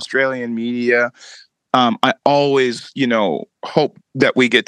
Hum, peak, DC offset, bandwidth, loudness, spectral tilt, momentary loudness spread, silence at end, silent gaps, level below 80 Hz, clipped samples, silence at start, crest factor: none; 0 dBFS; under 0.1%; 11 kHz; -17 LUFS; -5 dB/octave; 8 LU; 0.05 s; none; -68 dBFS; under 0.1%; 0 s; 18 dB